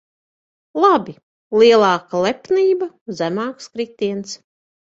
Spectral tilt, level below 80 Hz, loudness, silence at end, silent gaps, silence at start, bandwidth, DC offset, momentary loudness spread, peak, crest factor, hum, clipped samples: -5 dB/octave; -64 dBFS; -17 LUFS; 0.5 s; 1.23-1.50 s, 3.01-3.06 s; 0.75 s; 7.8 kHz; under 0.1%; 16 LU; -2 dBFS; 18 dB; none; under 0.1%